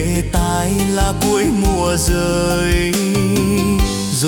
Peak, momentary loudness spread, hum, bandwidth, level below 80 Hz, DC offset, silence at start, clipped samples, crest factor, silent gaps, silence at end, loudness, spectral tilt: -4 dBFS; 2 LU; none; 18 kHz; -24 dBFS; under 0.1%; 0 s; under 0.1%; 12 dB; none; 0 s; -16 LUFS; -5 dB/octave